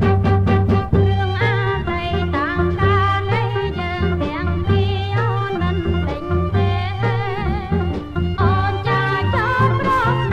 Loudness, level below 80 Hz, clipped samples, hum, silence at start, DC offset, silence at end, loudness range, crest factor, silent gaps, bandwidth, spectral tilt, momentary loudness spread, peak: -19 LUFS; -30 dBFS; under 0.1%; none; 0 s; under 0.1%; 0 s; 2 LU; 14 dB; none; 6.4 kHz; -8 dB/octave; 5 LU; -4 dBFS